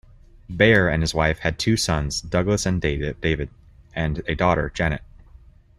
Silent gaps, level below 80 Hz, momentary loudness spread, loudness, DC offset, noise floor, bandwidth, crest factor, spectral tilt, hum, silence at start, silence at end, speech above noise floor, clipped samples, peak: none; -36 dBFS; 11 LU; -22 LUFS; under 0.1%; -49 dBFS; 13.5 kHz; 20 dB; -5 dB/octave; none; 0.5 s; 0.8 s; 27 dB; under 0.1%; -2 dBFS